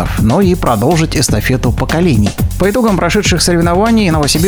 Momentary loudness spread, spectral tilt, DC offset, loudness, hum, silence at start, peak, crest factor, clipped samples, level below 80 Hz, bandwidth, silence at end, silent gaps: 3 LU; -5 dB/octave; under 0.1%; -11 LUFS; none; 0 s; 0 dBFS; 10 dB; under 0.1%; -22 dBFS; over 20 kHz; 0 s; none